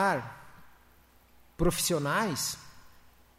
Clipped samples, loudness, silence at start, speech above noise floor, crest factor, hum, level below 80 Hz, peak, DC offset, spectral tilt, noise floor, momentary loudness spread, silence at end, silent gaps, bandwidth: under 0.1%; -30 LUFS; 0 s; 31 dB; 18 dB; none; -46 dBFS; -14 dBFS; under 0.1%; -3.5 dB/octave; -60 dBFS; 17 LU; 0.5 s; none; 16 kHz